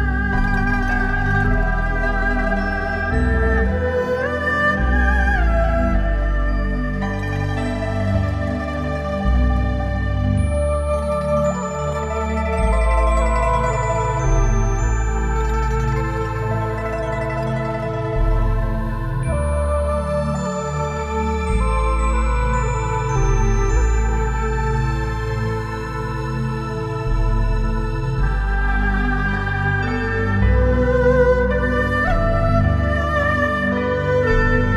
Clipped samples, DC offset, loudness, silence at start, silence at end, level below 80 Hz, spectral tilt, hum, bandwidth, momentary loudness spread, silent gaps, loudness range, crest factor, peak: under 0.1%; under 0.1%; -20 LUFS; 0 s; 0 s; -22 dBFS; -7 dB/octave; none; 10 kHz; 6 LU; none; 4 LU; 16 dB; -2 dBFS